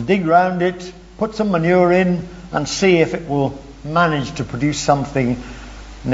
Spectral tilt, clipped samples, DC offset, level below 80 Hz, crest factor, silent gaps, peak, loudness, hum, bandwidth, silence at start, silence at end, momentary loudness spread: -6 dB/octave; under 0.1%; under 0.1%; -40 dBFS; 16 dB; none; -2 dBFS; -18 LUFS; none; 8 kHz; 0 s; 0 s; 16 LU